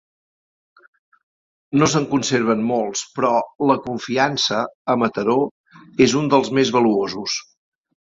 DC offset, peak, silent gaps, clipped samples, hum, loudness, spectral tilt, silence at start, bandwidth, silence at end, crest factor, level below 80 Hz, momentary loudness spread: under 0.1%; -2 dBFS; 4.75-4.85 s, 5.51-5.64 s; under 0.1%; none; -19 LUFS; -4.5 dB/octave; 1.7 s; 7.8 kHz; 0.7 s; 18 dB; -58 dBFS; 7 LU